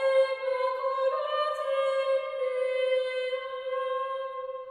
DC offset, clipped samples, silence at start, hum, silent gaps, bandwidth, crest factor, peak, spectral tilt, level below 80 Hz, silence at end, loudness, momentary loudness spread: under 0.1%; under 0.1%; 0 s; none; none; 10.5 kHz; 14 dB; -14 dBFS; 0 dB/octave; -78 dBFS; 0 s; -29 LUFS; 7 LU